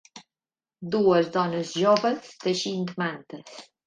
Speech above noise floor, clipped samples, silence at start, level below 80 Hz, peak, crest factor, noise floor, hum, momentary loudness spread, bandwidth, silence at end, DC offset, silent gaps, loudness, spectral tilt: over 65 dB; under 0.1%; 0.15 s; -70 dBFS; -8 dBFS; 18 dB; under -90 dBFS; none; 20 LU; 9.8 kHz; 0.25 s; under 0.1%; none; -25 LUFS; -5 dB/octave